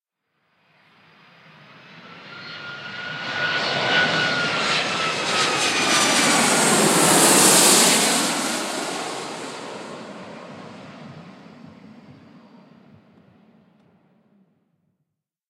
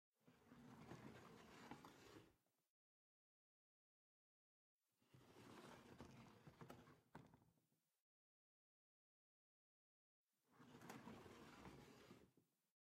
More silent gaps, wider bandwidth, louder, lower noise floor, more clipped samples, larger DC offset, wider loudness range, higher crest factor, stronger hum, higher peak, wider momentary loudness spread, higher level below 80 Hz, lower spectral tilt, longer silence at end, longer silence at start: second, none vs 2.69-4.79 s, 8.00-10.28 s; about the same, 16 kHz vs 15 kHz; first, -17 LUFS vs -65 LUFS; second, -78 dBFS vs -89 dBFS; neither; neither; first, 21 LU vs 3 LU; about the same, 22 dB vs 26 dB; neither; first, 0 dBFS vs -42 dBFS; first, 25 LU vs 6 LU; first, -70 dBFS vs -86 dBFS; second, -1.5 dB/octave vs -5 dB/octave; first, 3.4 s vs 0.4 s; first, 1.95 s vs 0.2 s